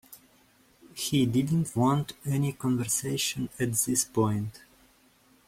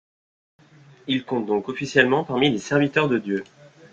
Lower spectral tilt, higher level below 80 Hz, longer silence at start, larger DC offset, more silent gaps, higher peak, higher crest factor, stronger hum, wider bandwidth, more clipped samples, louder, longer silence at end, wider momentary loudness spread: about the same, -4.5 dB/octave vs -5.5 dB/octave; about the same, -60 dBFS vs -62 dBFS; second, 0.1 s vs 1.05 s; neither; neither; second, -12 dBFS vs -2 dBFS; about the same, 18 dB vs 22 dB; neither; first, 16.5 kHz vs 8.6 kHz; neither; second, -28 LUFS vs -22 LUFS; first, 0.9 s vs 0.5 s; about the same, 7 LU vs 9 LU